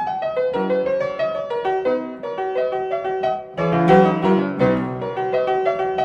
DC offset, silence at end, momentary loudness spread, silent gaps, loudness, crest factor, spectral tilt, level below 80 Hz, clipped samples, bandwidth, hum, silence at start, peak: under 0.1%; 0 s; 10 LU; none; -20 LUFS; 18 dB; -8 dB/octave; -52 dBFS; under 0.1%; 7.4 kHz; none; 0 s; -2 dBFS